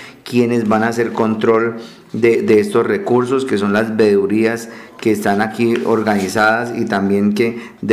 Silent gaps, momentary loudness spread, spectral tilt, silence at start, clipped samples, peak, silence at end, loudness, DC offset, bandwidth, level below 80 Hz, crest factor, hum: none; 7 LU; -6 dB/octave; 0 s; under 0.1%; -2 dBFS; 0 s; -15 LUFS; under 0.1%; 15 kHz; -58 dBFS; 12 dB; none